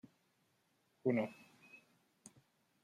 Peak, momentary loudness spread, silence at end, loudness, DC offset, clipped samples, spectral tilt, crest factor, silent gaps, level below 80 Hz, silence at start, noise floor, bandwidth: -22 dBFS; 25 LU; 1.05 s; -39 LUFS; under 0.1%; under 0.1%; -7 dB/octave; 24 dB; none; -90 dBFS; 1.05 s; -78 dBFS; 13.5 kHz